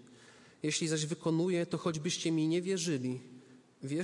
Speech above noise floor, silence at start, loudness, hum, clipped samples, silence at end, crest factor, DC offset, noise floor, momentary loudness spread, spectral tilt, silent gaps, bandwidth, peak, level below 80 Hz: 26 dB; 0 s; -34 LUFS; none; under 0.1%; 0 s; 14 dB; under 0.1%; -58 dBFS; 8 LU; -4.5 dB/octave; none; 11.5 kHz; -20 dBFS; -78 dBFS